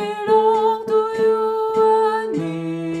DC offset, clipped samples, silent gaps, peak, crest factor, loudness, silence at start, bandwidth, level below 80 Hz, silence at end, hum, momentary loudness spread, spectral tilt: under 0.1%; under 0.1%; none; -4 dBFS; 14 dB; -18 LUFS; 0 s; 10 kHz; -64 dBFS; 0 s; none; 9 LU; -6.5 dB/octave